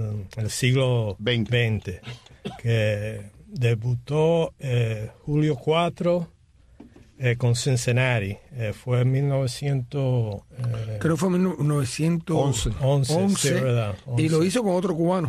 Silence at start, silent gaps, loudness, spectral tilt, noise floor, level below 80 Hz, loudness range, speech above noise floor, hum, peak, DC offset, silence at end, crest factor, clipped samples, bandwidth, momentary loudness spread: 0 s; none; -24 LUFS; -6 dB/octave; -51 dBFS; -46 dBFS; 3 LU; 28 dB; none; -8 dBFS; under 0.1%; 0 s; 16 dB; under 0.1%; 14 kHz; 10 LU